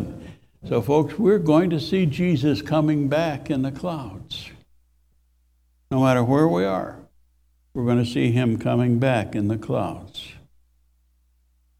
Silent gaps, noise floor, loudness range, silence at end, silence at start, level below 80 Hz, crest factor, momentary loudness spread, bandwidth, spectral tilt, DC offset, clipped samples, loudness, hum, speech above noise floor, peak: none; -63 dBFS; 5 LU; 1.4 s; 0 s; -52 dBFS; 18 dB; 16 LU; 15 kHz; -7.5 dB/octave; under 0.1%; under 0.1%; -22 LUFS; none; 42 dB; -4 dBFS